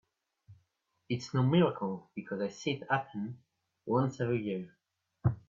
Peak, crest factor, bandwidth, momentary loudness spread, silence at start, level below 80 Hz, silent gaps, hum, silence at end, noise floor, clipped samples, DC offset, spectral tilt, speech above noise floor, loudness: -16 dBFS; 18 dB; 7.6 kHz; 14 LU; 0.5 s; -66 dBFS; none; none; 0.1 s; -77 dBFS; under 0.1%; under 0.1%; -7 dB/octave; 45 dB; -33 LUFS